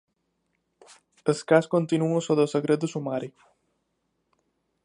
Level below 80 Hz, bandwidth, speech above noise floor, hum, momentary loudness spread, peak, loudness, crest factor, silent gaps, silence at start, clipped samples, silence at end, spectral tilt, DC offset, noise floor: -76 dBFS; 11 kHz; 52 dB; none; 10 LU; -6 dBFS; -25 LUFS; 22 dB; none; 1.25 s; under 0.1%; 1.55 s; -6.5 dB/octave; under 0.1%; -76 dBFS